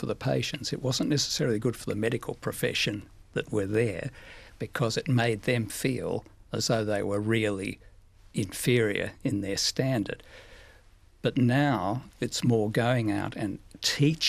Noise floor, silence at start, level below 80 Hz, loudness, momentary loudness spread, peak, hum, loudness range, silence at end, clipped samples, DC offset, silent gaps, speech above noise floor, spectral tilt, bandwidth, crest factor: -56 dBFS; 0 s; -54 dBFS; -28 LUFS; 11 LU; -10 dBFS; none; 2 LU; 0 s; under 0.1%; under 0.1%; none; 28 dB; -5 dB/octave; 14.5 kHz; 18 dB